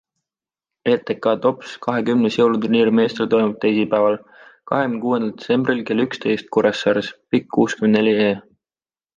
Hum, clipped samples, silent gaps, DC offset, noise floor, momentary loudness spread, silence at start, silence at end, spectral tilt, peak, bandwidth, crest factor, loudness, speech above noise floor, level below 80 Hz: none; under 0.1%; none; under 0.1%; under -90 dBFS; 6 LU; 0.85 s; 0.8 s; -6.5 dB/octave; -4 dBFS; 7.6 kHz; 16 dB; -19 LUFS; over 72 dB; -62 dBFS